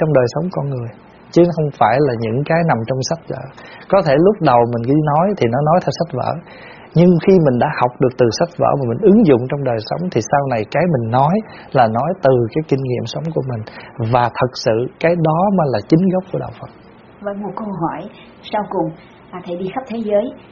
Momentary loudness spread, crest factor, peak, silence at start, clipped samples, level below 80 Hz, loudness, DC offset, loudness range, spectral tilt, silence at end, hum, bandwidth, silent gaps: 15 LU; 16 dB; 0 dBFS; 0 s; under 0.1%; -48 dBFS; -16 LUFS; under 0.1%; 6 LU; -6.5 dB/octave; 0.15 s; none; 7.2 kHz; none